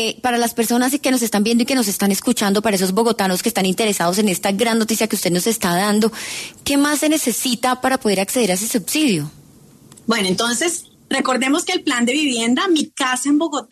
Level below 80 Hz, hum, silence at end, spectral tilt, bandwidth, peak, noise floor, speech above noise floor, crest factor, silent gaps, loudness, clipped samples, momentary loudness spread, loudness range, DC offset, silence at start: -56 dBFS; none; 0.1 s; -3.5 dB/octave; 14 kHz; -4 dBFS; -46 dBFS; 28 dB; 14 dB; none; -18 LUFS; under 0.1%; 3 LU; 2 LU; under 0.1%; 0 s